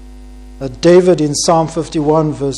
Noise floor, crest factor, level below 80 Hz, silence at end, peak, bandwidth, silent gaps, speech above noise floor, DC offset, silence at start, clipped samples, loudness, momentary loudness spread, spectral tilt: -34 dBFS; 14 dB; -36 dBFS; 0 s; 0 dBFS; 12 kHz; none; 21 dB; under 0.1%; 0 s; under 0.1%; -12 LUFS; 11 LU; -5.5 dB/octave